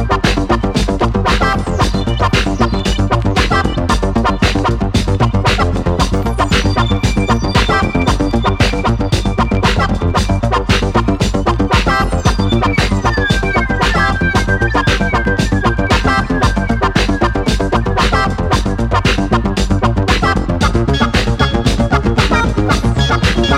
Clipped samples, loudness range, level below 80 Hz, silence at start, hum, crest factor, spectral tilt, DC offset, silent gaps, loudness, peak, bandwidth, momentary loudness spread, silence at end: under 0.1%; 1 LU; -18 dBFS; 0 s; none; 12 dB; -5.5 dB/octave; under 0.1%; none; -14 LUFS; 0 dBFS; 13.5 kHz; 2 LU; 0 s